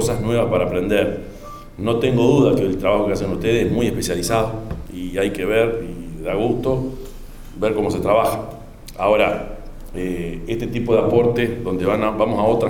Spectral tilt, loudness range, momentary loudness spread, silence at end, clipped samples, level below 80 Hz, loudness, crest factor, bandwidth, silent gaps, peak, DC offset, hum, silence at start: -6 dB/octave; 4 LU; 15 LU; 0 s; under 0.1%; -36 dBFS; -20 LUFS; 18 dB; 18 kHz; none; -2 dBFS; under 0.1%; none; 0 s